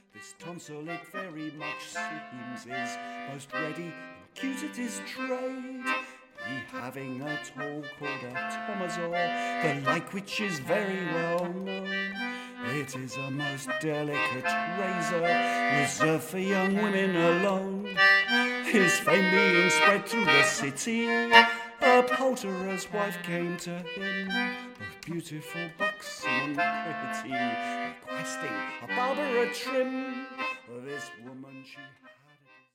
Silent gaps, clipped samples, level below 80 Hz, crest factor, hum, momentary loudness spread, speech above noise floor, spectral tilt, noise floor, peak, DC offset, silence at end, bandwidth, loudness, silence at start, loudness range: none; under 0.1%; -72 dBFS; 26 dB; none; 17 LU; 31 dB; -4 dB/octave; -60 dBFS; -4 dBFS; under 0.1%; 0.6 s; 16.5 kHz; -28 LUFS; 0.15 s; 13 LU